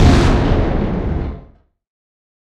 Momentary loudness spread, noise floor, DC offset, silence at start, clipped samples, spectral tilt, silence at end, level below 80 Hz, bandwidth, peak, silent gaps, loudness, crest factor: 14 LU; -46 dBFS; under 0.1%; 0 s; under 0.1%; -7 dB/octave; 1.05 s; -20 dBFS; 10.5 kHz; 0 dBFS; none; -17 LUFS; 16 dB